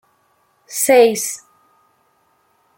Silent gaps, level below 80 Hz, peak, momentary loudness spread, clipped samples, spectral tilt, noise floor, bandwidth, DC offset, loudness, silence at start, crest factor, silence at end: none; -68 dBFS; -2 dBFS; 17 LU; under 0.1%; -2 dB/octave; -61 dBFS; 17 kHz; under 0.1%; -15 LUFS; 0.7 s; 18 dB; 1.4 s